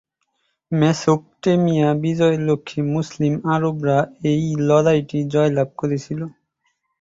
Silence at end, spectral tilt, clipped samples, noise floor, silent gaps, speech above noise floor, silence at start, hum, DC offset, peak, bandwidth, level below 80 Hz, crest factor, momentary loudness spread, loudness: 0.7 s; -7 dB/octave; under 0.1%; -70 dBFS; none; 52 dB; 0.7 s; none; under 0.1%; -2 dBFS; 7.8 kHz; -56 dBFS; 16 dB; 7 LU; -19 LUFS